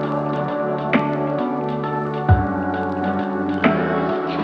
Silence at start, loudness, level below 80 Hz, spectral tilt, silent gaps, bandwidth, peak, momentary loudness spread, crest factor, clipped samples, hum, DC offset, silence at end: 0 s; -21 LUFS; -36 dBFS; -9 dB/octave; none; 6.2 kHz; -2 dBFS; 5 LU; 20 dB; under 0.1%; none; under 0.1%; 0 s